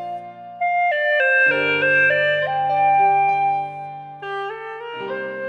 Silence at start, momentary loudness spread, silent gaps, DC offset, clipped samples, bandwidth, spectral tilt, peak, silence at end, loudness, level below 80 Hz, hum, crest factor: 0 s; 16 LU; none; under 0.1%; under 0.1%; 7.6 kHz; -5.5 dB/octave; -6 dBFS; 0 s; -18 LUFS; -70 dBFS; none; 14 dB